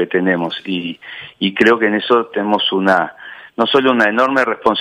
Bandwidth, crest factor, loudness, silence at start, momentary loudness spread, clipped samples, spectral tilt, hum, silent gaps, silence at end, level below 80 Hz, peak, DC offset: 13 kHz; 14 dB; -15 LUFS; 0 s; 14 LU; under 0.1%; -5.5 dB/octave; none; none; 0 s; -58 dBFS; 0 dBFS; under 0.1%